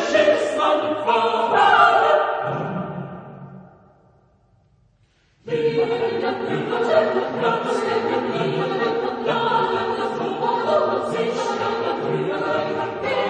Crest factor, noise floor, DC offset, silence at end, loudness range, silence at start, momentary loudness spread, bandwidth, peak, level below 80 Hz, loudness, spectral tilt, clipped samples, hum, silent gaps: 18 dB; -60 dBFS; under 0.1%; 0 s; 9 LU; 0 s; 8 LU; 9.8 kHz; -2 dBFS; -62 dBFS; -20 LUFS; -5 dB/octave; under 0.1%; none; none